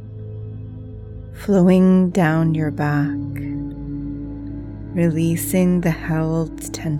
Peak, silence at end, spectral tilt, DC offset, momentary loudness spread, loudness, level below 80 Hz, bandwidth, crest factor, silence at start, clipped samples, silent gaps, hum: -2 dBFS; 0 s; -7.5 dB/octave; under 0.1%; 19 LU; -19 LUFS; -40 dBFS; 16.5 kHz; 16 dB; 0 s; under 0.1%; none; none